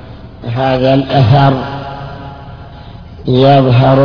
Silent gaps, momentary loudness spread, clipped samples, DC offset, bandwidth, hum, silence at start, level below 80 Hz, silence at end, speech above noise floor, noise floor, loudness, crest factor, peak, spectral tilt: none; 24 LU; 0.3%; under 0.1%; 5.4 kHz; none; 0 s; -36 dBFS; 0 s; 22 dB; -31 dBFS; -10 LUFS; 12 dB; 0 dBFS; -9 dB/octave